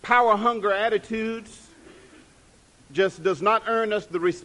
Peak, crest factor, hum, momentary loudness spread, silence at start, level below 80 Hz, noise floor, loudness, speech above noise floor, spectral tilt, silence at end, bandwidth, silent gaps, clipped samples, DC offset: -4 dBFS; 20 dB; none; 10 LU; 0.05 s; -60 dBFS; -55 dBFS; -23 LUFS; 32 dB; -5 dB/octave; 0.05 s; 11.5 kHz; none; under 0.1%; under 0.1%